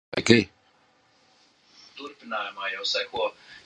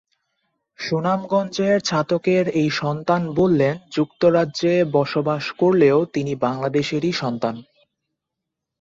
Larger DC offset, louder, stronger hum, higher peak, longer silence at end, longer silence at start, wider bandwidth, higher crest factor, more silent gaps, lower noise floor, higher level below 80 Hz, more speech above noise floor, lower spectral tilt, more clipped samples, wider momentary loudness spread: neither; second, -25 LUFS vs -20 LUFS; neither; about the same, -2 dBFS vs -4 dBFS; second, 0.05 s vs 1.2 s; second, 0.1 s vs 0.8 s; first, 10.5 kHz vs 7.8 kHz; first, 28 dB vs 16 dB; neither; second, -63 dBFS vs -82 dBFS; about the same, -60 dBFS vs -58 dBFS; second, 37 dB vs 63 dB; second, -4 dB/octave vs -6 dB/octave; neither; first, 21 LU vs 7 LU